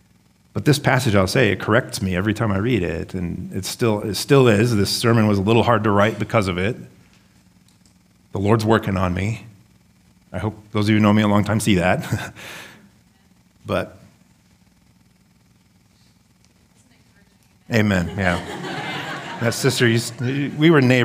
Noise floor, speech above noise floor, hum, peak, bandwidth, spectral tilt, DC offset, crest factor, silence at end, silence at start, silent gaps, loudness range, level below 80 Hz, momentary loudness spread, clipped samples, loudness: -56 dBFS; 38 dB; none; 0 dBFS; 16 kHz; -5.5 dB/octave; under 0.1%; 20 dB; 0 s; 0.55 s; none; 14 LU; -50 dBFS; 12 LU; under 0.1%; -19 LUFS